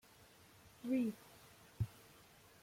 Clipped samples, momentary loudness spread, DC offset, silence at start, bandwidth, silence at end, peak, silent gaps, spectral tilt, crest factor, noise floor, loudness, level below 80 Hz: under 0.1%; 24 LU; under 0.1%; 0.65 s; 16.5 kHz; 0.7 s; -28 dBFS; none; -7 dB/octave; 18 dB; -65 dBFS; -42 LUFS; -68 dBFS